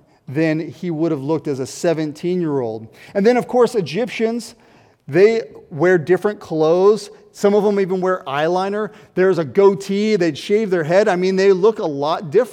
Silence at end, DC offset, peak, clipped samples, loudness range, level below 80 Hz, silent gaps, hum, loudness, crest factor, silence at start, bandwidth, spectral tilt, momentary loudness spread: 0 s; under 0.1%; -2 dBFS; under 0.1%; 3 LU; -66 dBFS; none; none; -18 LUFS; 16 dB; 0.3 s; 13.5 kHz; -6.5 dB/octave; 10 LU